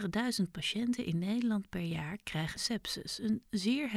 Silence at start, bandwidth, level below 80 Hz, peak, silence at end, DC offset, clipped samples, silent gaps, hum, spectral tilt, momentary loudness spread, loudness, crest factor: 0 s; 15.5 kHz; -60 dBFS; -20 dBFS; 0 s; under 0.1%; under 0.1%; none; none; -4.5 dB/octave; 5 LU; -35 LUFS; 14 dB